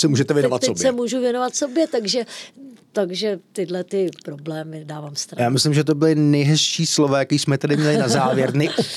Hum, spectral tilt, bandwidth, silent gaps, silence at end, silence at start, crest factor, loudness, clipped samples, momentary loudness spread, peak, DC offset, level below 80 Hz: none; -5 dB/octave; 14 kHz; none; 0 s; 0 s; 14 dB; -19 LUFS; under 0.1%; 13 LU; -6 dBFS; under 0.1%; -70 dBFS